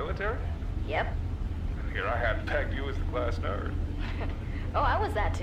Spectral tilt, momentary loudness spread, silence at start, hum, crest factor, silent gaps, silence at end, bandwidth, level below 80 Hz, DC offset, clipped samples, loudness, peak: -7 dB/octave; 7 LU; 0 s; none; 16 dB; none; 0 s; 9 kHz; -34 dBFS; under 0.1%; under 0.1%; -32 LUFS; -14 dBFS